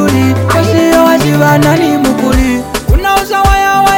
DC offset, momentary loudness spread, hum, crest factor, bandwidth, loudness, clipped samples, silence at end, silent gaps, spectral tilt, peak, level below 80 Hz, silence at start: under 0.1%; 4 LU; none; 8 dB; 17.5 kHz; -9 LUFS; under 0.1%; 0 s; none; -5.5 dB/octave; 0 dBFS; -18 dBFS; 0 s